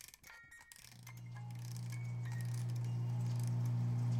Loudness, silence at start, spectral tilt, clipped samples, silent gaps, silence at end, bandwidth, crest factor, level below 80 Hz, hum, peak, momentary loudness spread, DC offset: -41 LUFS; 0 s; -6.5 dB/octave; under 0.1%; none; 0 s; 14.5 kHz; 12 dB; -72 dBFS; none; -30 dBFS; 18 LU; under 0.1%